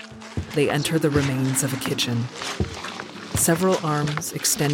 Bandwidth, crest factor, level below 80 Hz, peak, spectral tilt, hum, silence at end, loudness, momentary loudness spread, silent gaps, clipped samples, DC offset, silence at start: 17 kHz; 16 dB; -46 dBFS; -8 dBFS; -4 dB/octave; none; 0 s; -23 LUFS; 11 LU; none; under 0.1%; under 0.1%; 0 s